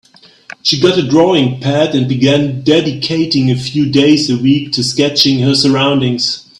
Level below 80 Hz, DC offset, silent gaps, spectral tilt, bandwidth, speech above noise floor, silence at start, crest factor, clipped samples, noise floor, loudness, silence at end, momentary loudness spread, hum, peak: -48 dBFS; under 0.1%; none; -5.5 dB/octave; 13.5 kHz; 24 dB; 0.65 s; 12 dB; under 0.1%; -36 dBFS; -12 LUFS; 0.2 s; 5 LU; none; 0 dBFS